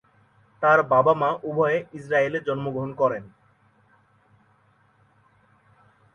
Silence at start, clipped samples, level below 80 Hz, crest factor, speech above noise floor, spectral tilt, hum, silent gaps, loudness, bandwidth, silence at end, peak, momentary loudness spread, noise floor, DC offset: 0.6 s; under 0.1%; -66 dBFS; 20 dB; 39 dB; -7.5 dB/octave; none; none; -23 LUFS; 9.6 kHz; 2.85 s; -6 dBFS; 10 LU; -62 dBFS; under 0.1%